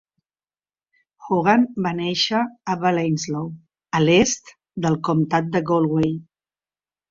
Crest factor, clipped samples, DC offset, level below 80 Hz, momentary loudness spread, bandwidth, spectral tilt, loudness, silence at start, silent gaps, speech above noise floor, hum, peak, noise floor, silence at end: 18 dB; under 0.1%; under 0.1%; -54 dBFS; 10 LU; 7.6 kHz; -5 dB/octave; -21 LUFS; 1.2 s; none; over 70 dB; none; -4 dBFS; under -90 dBFS; 0.9 s